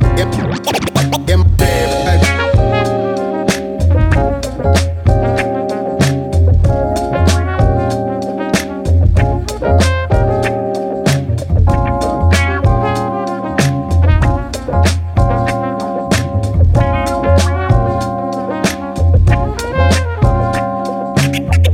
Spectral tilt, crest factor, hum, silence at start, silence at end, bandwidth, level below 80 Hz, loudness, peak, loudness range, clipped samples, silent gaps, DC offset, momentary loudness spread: -6 dB/octave; 12 dB; none; 0 s; 0 s; 15.5 kHz; -20 dBFS; -14 LUFS; 0 dBFS; 1 LU; under 0.1%; none; under 0.1%; 6 LU